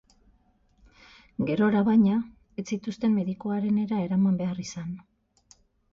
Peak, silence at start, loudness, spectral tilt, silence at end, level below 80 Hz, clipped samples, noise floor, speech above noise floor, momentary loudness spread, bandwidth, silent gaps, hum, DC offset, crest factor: -12 dBFS; 1.4 s; -26 LUFS; -7.5 dB/octave; 0.95 s; -60 dBFS; under 0.1%; -64 dBFS; 39 dB; 17 LU; 7.4 kHz; none; none; under 0.1%; 16 dB